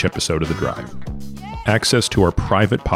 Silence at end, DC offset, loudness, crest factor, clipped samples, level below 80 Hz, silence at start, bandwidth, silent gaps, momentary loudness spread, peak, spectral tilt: 0 s; under 0.1%; -18 LUFS; 16 dB; under 0.1%; -32 dBFS; 0 s; 15.5 kHz; none; 16 LU; -2 dBFS; -4.5 dB/octave